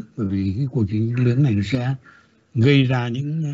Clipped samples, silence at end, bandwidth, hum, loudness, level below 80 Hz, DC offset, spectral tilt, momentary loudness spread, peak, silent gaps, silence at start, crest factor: under 0.1%; 0 s; 7.6 kHz; none; -20 LUFS; -54 dBFS; under 0.1%; -8 dB/octave; 9 LU; -4 dBFS; none; 0 s; 16 dB